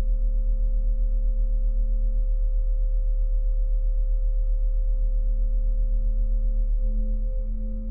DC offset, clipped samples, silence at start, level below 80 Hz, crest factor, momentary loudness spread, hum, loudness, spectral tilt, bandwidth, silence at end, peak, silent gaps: 0.9%; under 0.1%; 0 s; -22 dBFS; 6 dB; 1 LU; none; -28 LUFS; -14 dB/octave; 0.6 kHz; 0 s; -16 dBFS; none